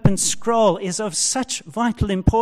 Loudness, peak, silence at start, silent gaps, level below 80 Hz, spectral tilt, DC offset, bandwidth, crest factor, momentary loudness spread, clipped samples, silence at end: -20 LUFS; -4 dBFS; 0.05 s; none; -32 dBFS; -4.5 dB/octave; under 0.1%; 15.5 kHz; 16 dB; 6 LU; under 0.1%; 0 s